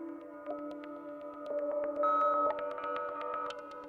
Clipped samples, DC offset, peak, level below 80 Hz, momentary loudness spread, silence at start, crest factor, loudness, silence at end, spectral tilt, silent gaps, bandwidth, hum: under 0.1%; under 0.1%; -20 dBFS; -76 dBFS; 16 LU; 0 s; 14 dB; -35 LUFS; 0 s; -5.5 dB/octave; none; 7.4 kHz; none